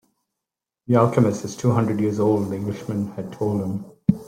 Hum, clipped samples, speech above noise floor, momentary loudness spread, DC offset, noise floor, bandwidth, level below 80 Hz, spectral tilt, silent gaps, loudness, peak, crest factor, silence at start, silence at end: none; under 0.1%; 65 dB; 9 LU; under 0.1%; -86 dBFS; 15.5 kHz; -54 dBFS; -8 dB/octave; none; -22 LUFS; -2 dBFS; 20 dB; 0.9 s; 0 s